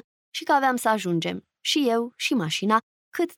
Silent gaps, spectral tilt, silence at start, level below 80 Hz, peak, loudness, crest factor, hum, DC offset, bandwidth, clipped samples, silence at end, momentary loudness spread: 2.83-3.12 s; -4 dB/octave; 0.35 s; -76 dBFS; -8 dBFS; -24 LUFS; 18 dB; none; under 0.1%; 18.5 kHz; under 0.1%; 0.05 s; 10 LU